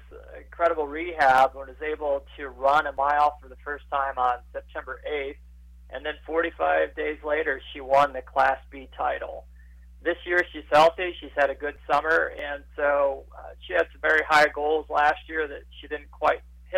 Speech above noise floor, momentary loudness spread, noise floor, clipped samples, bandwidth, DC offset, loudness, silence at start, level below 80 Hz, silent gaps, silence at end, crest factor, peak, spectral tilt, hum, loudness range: 23 dB; 17 LU; -48 dBFS; under 0.1%; 15.5 kHz; under 0.1%; -25 LUFS; 0 s; -48 dBFS; none; 0 s; 14 dB; -10 dBFS; -4.5 dB/octave; none; 5 LU